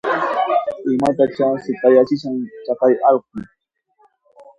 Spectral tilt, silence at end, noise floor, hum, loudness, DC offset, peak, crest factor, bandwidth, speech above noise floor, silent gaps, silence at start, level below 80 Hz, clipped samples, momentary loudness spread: -7 dB/octave; 1.15 s; -59 dBFS; none; -17 LUFS; under 0.1%; 0 dBFS; 18 dB; 10.5 kHz; 43 dB; none; 0.05 s; -60 dBFS; under 0.1%; 12 LU